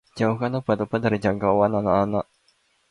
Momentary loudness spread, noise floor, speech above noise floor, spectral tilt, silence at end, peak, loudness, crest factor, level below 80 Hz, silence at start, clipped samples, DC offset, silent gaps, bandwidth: 5 LU; -65 dBFS; 43 dB; -8 dB/octave; 0.7 s; -6 dBFS; -23 LUFS; 18 dB; -50 dBFS; 0.15 s; under 0.1%; under 0.1%; none; 11 kHz